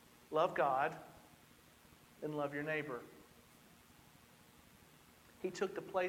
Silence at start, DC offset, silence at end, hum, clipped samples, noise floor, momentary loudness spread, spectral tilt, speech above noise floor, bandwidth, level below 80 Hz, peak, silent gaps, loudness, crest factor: 0.3 s; under 0.1%; 0 s; none; under 0.1%; -65 dBFS; 26 LU; -5.5 dB/octave; 26 dB; 17 kHz; -76 dBFS; -20 dBFS; none; -39 LUFS; 22 dB